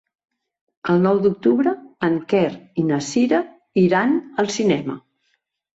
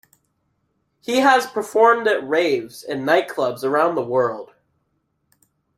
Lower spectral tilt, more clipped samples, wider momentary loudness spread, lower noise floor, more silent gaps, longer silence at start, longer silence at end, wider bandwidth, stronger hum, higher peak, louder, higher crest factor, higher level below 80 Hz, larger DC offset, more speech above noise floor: first, -6 dB/octave vs -4 dB/octave; neither; second, 7 LU vs 10 LU; about the same, -70 dBFS vs -70 dBFS; neither; second, 0.85 s vs 1.1 s; second, 0.75 s vs 1.3 s; second, 8 kHz vs 15.5 kHz; neither; about the same, -4 dBFS vs -2 dBFS; about the same, -20 LUFS vs -19 LUFS; about the same, 16 dB vs 18 dB; first, -62 dBFS vs -68 dBFS; neither; about the same, 51 dB vs 52 dB